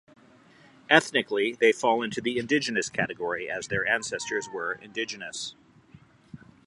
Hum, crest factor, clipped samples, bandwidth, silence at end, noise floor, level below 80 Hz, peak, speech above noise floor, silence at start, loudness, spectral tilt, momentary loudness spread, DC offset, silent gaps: none; 26 dB; under 0.1%; 11.5 kHz; 0.3 s; -56 dBFS; -66 dBFS; -2 dBFS; 29 dB; 0.9 s; -26 LUFS; -3 dB/octave; 11 LU; under 0.1%; none